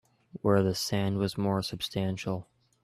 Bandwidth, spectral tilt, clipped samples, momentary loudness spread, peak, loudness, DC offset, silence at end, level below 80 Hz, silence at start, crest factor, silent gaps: 14 kHz; -5.5 dB/octave; under 0.1%; 9 LU; -12 dBFS; -30 LUFS; under 0.1%; 0.4 s; -62 dBFS; 0.35 s; 18 dB; none